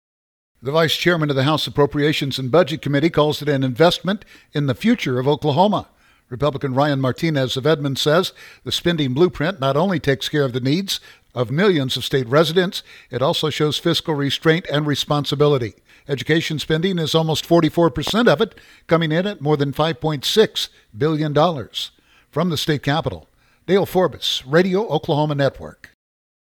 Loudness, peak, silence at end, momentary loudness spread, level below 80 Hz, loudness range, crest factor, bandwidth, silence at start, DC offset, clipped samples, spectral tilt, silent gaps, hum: -19 LUFS; 0 dBFS; 0.7 s; 9 LU; -50 dBFS; 2 LU; 18 dB; 19 kHz; 0.65 s; under 0.1%; under 0.1%; -5.5 dB/octave; none; none